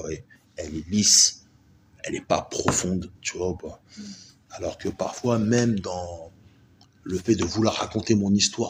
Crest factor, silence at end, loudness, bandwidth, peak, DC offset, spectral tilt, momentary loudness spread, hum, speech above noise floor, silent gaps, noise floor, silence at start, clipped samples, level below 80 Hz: 22 dB; 0 s; -23 LUFS; 16 kHz; -4 dBFS; under 0.1%; -3.5 dB/octave; 22 LU; none; 32 dB; none; -57 dBFS; 0 s; under 0.1%; -52 dBFS